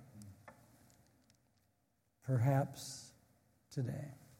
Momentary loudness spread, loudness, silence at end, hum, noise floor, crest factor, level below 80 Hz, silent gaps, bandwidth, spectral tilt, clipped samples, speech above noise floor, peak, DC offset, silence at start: 25 LU; -39 LUFS; 0.25 s; none; -80 dBFS; 22 dB; -76 dBFS; none; 16 kHz; -6.5 dB/octave; under 0.1%; 43 dB; -20 dBFS; under 0.1%; 0 s